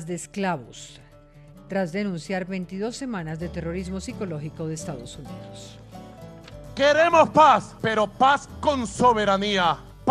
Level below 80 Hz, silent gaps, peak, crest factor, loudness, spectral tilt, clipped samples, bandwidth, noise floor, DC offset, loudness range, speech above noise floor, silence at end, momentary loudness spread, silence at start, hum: -50 dBFS; none; -4 dBFS; 20 dB; -23 LUFS; -5 dB/octave; under 0.1%; 13 kHz; -49 dBFS; under 0.1%; 13 LU; 25 dB; 0 s; 25 LU; 0 s; none